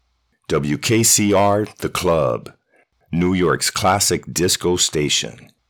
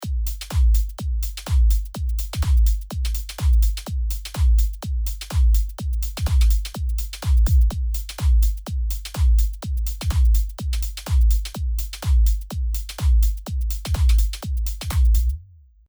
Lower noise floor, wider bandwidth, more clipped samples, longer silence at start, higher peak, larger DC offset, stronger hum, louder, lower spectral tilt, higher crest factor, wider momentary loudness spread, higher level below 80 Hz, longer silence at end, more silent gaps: first, -60 dBFS vs -47 dBFS; about the same, over 20 kHz vs over 20 kHz; neither; first, 0.5 s vs 0 s; first, -4 dBFS vs -8 dBFS; neither; neither; first, -17 LUFS vs -23 LUFS; second, -3.5 dB/octave vs -5 dB/octave; about the same, 14 dB vs 12 dB; about the same, 9 LU vs 7 LU; second, -46 dBFS vs -20 dBFS; about the same, 0.4 s vs 0.45 s; neither